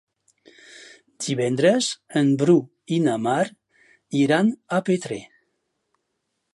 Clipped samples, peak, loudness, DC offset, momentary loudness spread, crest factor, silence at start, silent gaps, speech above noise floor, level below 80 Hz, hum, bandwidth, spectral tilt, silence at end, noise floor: under 0.1%; -6 dBFS; -22 LUFS; under 0.1%; 9 LU; 18 dB; 1.2 s; none; 56 dB; -72 dBFS; none; 11.5 kHz; -5.5 dB/octave; 1.3 s; -77 dBFS